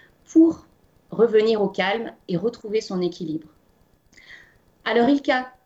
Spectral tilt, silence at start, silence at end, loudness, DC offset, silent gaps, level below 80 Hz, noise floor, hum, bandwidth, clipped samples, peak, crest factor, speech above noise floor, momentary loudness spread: -6 dB/octave; 0.3 s; 0.15 s; -22 LUFS; under 0.1%; none; -62 dBFS; -60 dBFS; none; 7.8 kHz; under 0.1%; -6 dBFS; 16 dB; 39 dB; 14 LU